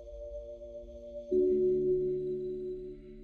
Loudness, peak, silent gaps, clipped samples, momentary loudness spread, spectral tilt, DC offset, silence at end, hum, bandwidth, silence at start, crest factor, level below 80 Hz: -32 LUFS; -18 dBFS; none; under 0.1%; 18 LU; -10.5 dB/octave; under 0.1%; 0 s; none; 4.2 kHz; 0 s; 14 dB; -54 dBFS